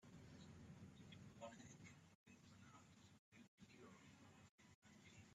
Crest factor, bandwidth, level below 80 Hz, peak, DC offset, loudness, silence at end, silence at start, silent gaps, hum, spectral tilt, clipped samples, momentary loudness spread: 20 dB; 11.5 kHz; -84 dBFS; -44 dBFS; under 0.1%; -65 LUFS; 0 s; 0 s; 2.15-2.26 s, 3.19-3.32 s, 3.48-3.58 s, 4.51-4.58 s, 4.74-4.82 s; none; -5 dB/octave; under 0.1%; 9 LU